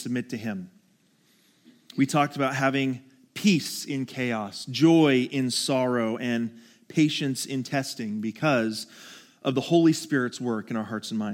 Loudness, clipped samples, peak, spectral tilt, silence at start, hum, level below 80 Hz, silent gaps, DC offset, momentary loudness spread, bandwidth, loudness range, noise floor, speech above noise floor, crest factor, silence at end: -26 LUFS; under 0.1%; -8 dBFS; -5 dB/octave; 0 s; none; -78 dBFS; none; under 0.1%; 12 LU; 17 kHz; 4 LU; -64 dBFS; 39 dB; 18 dB; 0 s